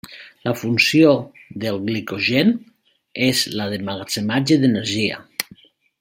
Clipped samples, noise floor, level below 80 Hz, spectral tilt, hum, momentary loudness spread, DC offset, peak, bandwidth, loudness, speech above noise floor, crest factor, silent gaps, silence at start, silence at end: under 0.1%; -49 dBFS; -60 dBFS; -4.5 dB/octave; none; 13 LU; under 0.1%; 0 dBFS; 16.5 kHz; -19 LUFS; 31 dB; 20 dB; none; 0.05 s; 0.6 s